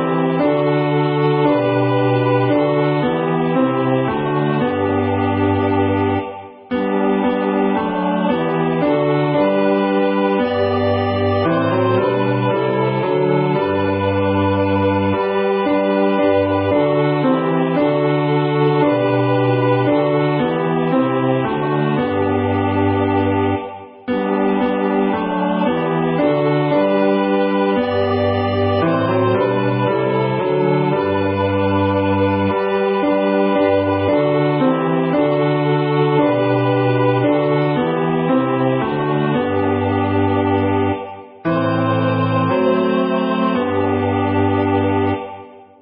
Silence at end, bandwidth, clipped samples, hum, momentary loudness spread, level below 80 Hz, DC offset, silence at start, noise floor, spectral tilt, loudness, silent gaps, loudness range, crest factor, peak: 0.2 s; 5.6 kHz; under 0.1%; none; 3 LU; -42 dBFS; under 0.1%; 0 s; -37 dBFS; -12.5 dB/octave; -17 LUFS; none; 2 LU; 12 dB; -4 dBFS